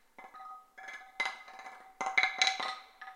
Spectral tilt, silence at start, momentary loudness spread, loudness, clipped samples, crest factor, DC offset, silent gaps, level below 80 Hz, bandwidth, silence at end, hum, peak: 2 dB/octave; 0.2 s; 21 LU; -32 LUFS; under 0.1%; 28 dB; under 0.1%; none; -78 dBFS; 16.5 kHz; 0 s; none; -8 dBFS